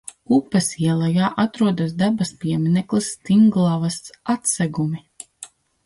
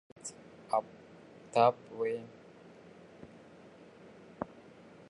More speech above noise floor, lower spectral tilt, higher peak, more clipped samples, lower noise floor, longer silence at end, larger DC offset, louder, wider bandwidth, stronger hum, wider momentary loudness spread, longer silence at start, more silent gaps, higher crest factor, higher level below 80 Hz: about the same, 25 dB vs 24 dB; about the same, -5.5 dB/octave vs -4.5 dB/octave; first, -6 dBFS vs -14 dBFS; neither; second, -44 dBFS vs -56 dBFS; second, 0.4 s vs 0.65 s; neither; first, -20 LUFS vs -34 LUFS; about the same, 11.5 kHz vs 10.5 kHz; neither; second, 15 LU vs 27 LU; about the same, 0.3 s vs 0.25 s; neither; second, 14 dB vs 24 dB; first, -58 dBFS vs -76 dBFS